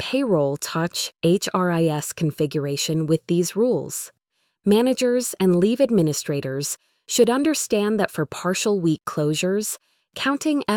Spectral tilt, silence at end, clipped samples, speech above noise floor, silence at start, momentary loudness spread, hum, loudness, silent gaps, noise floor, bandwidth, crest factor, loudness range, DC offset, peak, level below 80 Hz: -5 dB/octave; 0 s; under 0.1%; 47 dB; 0 s; 8 LU; none; -22 LUFS; none; -68 dBFS; 19 kHz; 18 dB; 2 LU; under 0.1%; -4 dBFS; -60 dBFS